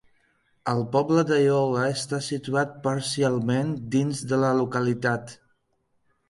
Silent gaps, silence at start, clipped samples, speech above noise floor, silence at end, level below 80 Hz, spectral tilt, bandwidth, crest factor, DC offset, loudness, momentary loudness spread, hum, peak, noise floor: none; 0.65 s; under 0.1%; 47 dB; 0.95 s; -64 dBFS; -6 dB/octave; 11.5 kHz; 16 dB; under 0.1%; -25 LUFS; 7 LU; none; -8 dBFS; -71 dBFS